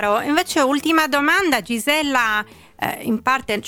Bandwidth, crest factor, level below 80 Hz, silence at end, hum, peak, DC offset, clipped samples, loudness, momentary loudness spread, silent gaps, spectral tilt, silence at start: 18.5 kHz; 16 dB; -54 dBFS; 0 s; none; -4 dBFS; under 0.1%; under 0.1%; -18 LUFS; 8 LU; none; -3 dB/octave; 0 s